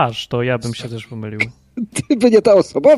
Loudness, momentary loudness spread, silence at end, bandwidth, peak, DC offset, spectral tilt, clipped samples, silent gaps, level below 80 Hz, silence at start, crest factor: -16 LUFS; 17 LU; 0 s; 12.5 kHz; -2 dBFS; under 0.1%; -5.5 dB/octave; under 0.1%; none; -50 dBFS; 0 s; 14 dB